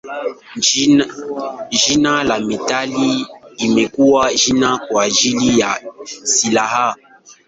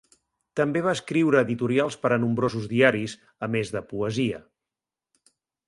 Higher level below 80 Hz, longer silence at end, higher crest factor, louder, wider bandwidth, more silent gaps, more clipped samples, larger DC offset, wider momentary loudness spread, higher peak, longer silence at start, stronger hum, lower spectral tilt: first, -50 dBFS vs -62 dBFS; second, 0.15 s vs 1.3 s; second, 16 dB vs 22 dB; first, -15 LUFS vs -25 LUFS; second, 8.2 kHz vs 11.5 kHz; neither; neither; neither; about the same, 12 LU vs 10 LU; about the same, -2 dBFS vs -4 dBFS; second, 0.05 s vs 0.55 s; neither; second, -2.5 dB/octave vs -6 dB/octave